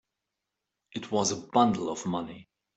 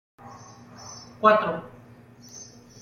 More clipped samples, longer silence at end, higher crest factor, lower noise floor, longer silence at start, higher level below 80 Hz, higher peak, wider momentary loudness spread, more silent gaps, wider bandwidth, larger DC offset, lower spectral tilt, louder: neither; about the same, 0.35 s vs 0.4 s; about the same, 22 dB vs 24 dB; first, -86 dBFS vs -49 dBFS; first, 0.95 s vs 0.25 s; about the same, -68 dBFS vs -66 dBFS; second, -10 dBFS vs -4 dBFS; second, 16 LU vs 27 LU; neither; first, 8.4 kHz vs 7 kHz; neither; about the same, -4.5 dB/octave vs -4.5 dB/octave; second, -28 LUFS vs -22 LUFS